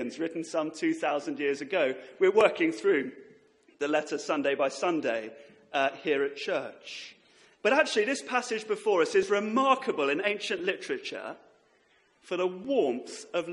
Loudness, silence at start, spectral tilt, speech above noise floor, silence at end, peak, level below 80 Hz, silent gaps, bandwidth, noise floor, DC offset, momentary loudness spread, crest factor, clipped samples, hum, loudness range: -29 LUFS; 0 s; -3.5 dB/octave; 37 dB; 0 s; -6 dBFS; -78 dBFS; none; 11.5 kHz; -66 dBFS; under 0.1%; 12 LU; 22 dB; under 0.1%; none; 4 LU